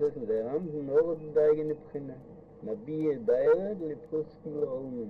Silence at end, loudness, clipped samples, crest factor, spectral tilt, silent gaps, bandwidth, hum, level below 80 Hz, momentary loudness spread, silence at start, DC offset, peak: 0 s; -30 LUFS; under 0.1%; 16 dB; -10 dB/octave; none; 4.2 kHz; none; -64 dBFS; 15 LU; 0 s; under 0.1%; -14 dBFS